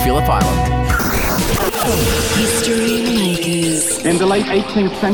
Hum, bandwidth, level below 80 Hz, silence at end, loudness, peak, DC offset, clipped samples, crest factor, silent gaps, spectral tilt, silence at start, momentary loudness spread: none; over 20 kHz; -26 dBFS; 0 s; -15 LUFS; -2 dBFS; under 0.1%; under 0.1%; 12 dB; none; -4 dB/octave; 0 s; 2 LU